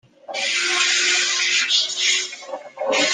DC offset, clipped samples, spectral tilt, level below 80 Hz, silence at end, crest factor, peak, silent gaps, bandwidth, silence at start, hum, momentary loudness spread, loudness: under 0.1%; under 0.1%; 2 dB/octave; -76 dBFS; 0 s; 16 dB; -4 dBFS; none; 14 kHz; 0.3 s; none; 13 LU; -18 LUFS